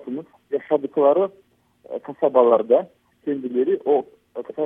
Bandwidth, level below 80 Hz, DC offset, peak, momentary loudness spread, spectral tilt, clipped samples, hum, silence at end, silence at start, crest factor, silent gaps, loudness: 3.7 kHz; -74 dBFS; under 0.1%; -2 dBFS; 17 LU; -9 dB/octave; under 0.1%; none; 0 s; 0.05 s; 18 dB; none; -20 LUFS